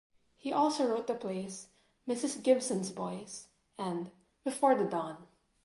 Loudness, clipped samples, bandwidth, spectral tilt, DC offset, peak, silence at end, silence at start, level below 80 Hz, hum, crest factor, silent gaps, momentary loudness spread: -33 LUFS; under 0.1%; 11.5 kHz; -4.5 dB/octave; under 0.1%; -14 dBFS; 0.4 s; 0.45 s; -76 dBFS; none; 20 dB; none; 18 LU